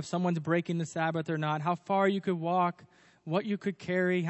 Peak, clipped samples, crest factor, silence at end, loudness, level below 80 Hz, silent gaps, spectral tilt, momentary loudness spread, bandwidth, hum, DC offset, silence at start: -14 dBFS; under 0.1%; 16 dB; 0 s; -31 LUFS; -78 dBFS; none; -6.5 dB/octave; 6 LU; 8.4 kHz; none; under 0.1%; 0 s